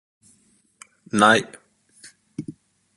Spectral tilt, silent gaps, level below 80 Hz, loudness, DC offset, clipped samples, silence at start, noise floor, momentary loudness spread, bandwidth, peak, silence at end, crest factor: -3.5 dB/octave; none; -64 dBFS; -18 LUFS; under 0.1%; under 0.1%; 1.15 s; -61 dBFS; 24 LU; 11.5 kHz; 0 dBFS; 0.45 s; 24 dB